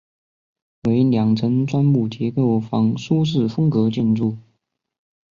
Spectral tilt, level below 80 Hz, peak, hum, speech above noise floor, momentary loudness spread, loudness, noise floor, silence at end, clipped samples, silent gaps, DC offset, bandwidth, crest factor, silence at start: -8.5 dB/octave; -56 dBFS; -6 dBFS; none; 52 dB; 5 LU; -19 LUFS; -70 dBFS; 0.9 s; under 0.1%; none; under 0.1%; 7.2 kHz; 14 dB; 0.85 s